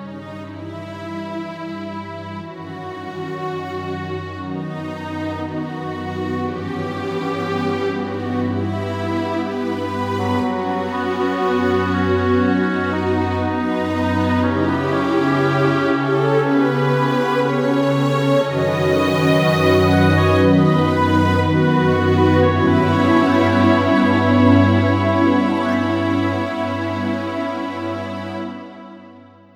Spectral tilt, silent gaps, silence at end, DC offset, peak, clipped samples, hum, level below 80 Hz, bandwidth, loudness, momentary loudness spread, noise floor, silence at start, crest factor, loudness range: -7.5 dB/octave; none; 0.35 s; under 0.1%; -2 dBFS; under 0.1%; none; -52 dBFS; 19 kHz; -18 LUFS; 14 LU; -43 dBFS; 0 s; 16 dB; 12 LU